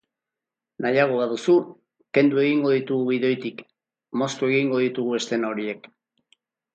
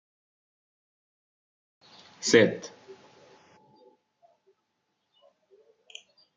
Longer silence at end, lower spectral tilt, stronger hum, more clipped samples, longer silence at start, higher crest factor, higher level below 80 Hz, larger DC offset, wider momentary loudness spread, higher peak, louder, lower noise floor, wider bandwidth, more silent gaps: second, 1 s vs 3.7 s; first, -5.5 dB/octave vs -3.5 dB/octave; neither; neither; second, 0.8 s vs 2.2 s; second, 20 dB vs 28 dB; about the same, -74 dBFS vs -74 dBFS; neither; second, 12 LU vs 27 LU; about the same, -4 dBFS vs -6 dBFS; about the same, -23 LUFS vs -24 LUFS; first, -88 dBFS vs -79 dBFS; about the same, 9 kHz vs 9 kHz; neither